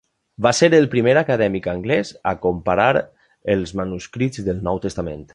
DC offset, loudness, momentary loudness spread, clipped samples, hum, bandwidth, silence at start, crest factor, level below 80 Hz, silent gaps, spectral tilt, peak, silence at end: under 0.1%; -19 LUFS; 12 LU; under 0.1%; none; 11 kHz; 0.4 s; 18 dB; -44 dBFS; none; -5.5 dB/octave; -2 dBFS; 0.1 s